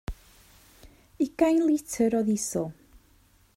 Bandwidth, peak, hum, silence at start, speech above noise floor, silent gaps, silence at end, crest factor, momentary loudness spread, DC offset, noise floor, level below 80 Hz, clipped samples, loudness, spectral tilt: 16 kHz; -10 dBFS; none; 0.1 s; 36 dB; none; 0.85 s; 18 dB; 15 LU; under 0.1%; -61 dBFS; -50 dBFS; under 0.1%; -26 LUFS; -5.5 dB/octave